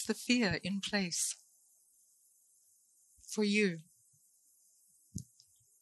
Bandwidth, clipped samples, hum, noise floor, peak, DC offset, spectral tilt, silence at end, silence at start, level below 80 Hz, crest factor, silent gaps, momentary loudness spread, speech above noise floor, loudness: 12 kHz; under 0.1%; none; -69 dBFS; -16 dBFS; under 0.1%; -3.5 dB/octave; 0.6 s; 0 s; -66 dBFS; 22 dB; none; 18 LU; 36 dB; -33 LUFS